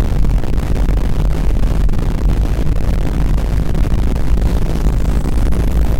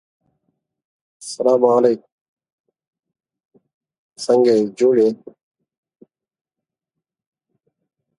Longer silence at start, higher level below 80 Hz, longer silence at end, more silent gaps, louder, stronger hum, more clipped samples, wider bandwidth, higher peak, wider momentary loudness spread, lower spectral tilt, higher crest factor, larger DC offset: second, 0 s vs 1.2 s; first, -14 dBFS vs -74 dBFS; second, 0 s vs 3.05 s; second, none vs 2.12-2.37 s, 2.52-2.64 s, 2.87-2.93 s, 3.45-3.49 s, 3.74-3.81 s, 3.98-4.10 s; about the same, -18 LUFS vs -16 LUFS; neither; neither; first, 15.5 kHz vs 11.5 kHz; about the same, -2 dBFS vs 0 dBFS; second, 1 LU vs 17 LU; first, -7.5 dB/octave vs -5.5 dB/octave; second, 10 dB vs 20 dB; neither